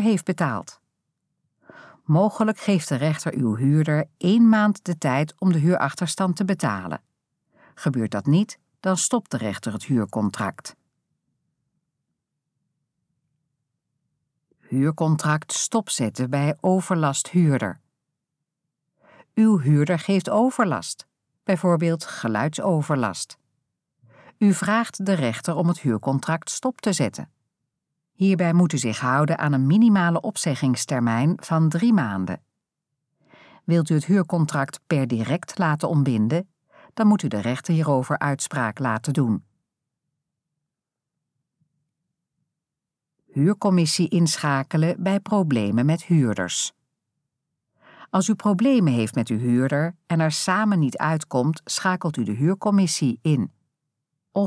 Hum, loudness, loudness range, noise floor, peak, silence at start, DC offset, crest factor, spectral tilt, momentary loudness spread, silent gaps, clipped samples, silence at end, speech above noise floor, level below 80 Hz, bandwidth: none; -22 LUFS; 6 LU; -86 dBFS; -6 dBFS; 0 s; under 0.1%; 16 dB; -6 dB/octave; 8 LU; none; under 0.1%; 0 s; 65 dB; -70 dBFS; 11 kHz